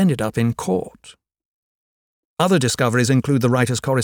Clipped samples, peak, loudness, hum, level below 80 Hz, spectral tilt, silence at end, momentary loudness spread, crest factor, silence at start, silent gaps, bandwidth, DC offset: under 0.1%; -4 dBFS; -19 LUFS; none; -52 dBFS; -5.5 dB/octave; 0 s; 7 LU; 16 dB; 0 s; 1.45-2.36 s; 17.5 kHz; under 0.1%